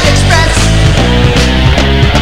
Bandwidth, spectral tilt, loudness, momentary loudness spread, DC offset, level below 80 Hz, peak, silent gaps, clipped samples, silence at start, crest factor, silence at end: 15.5 kHz; -4.5 dB/octave; -8 LUFS; 1 LU; 6%; -12 dBFS; 0 dBFS; none; 0.5%; 0 s; 8 dB; 0 s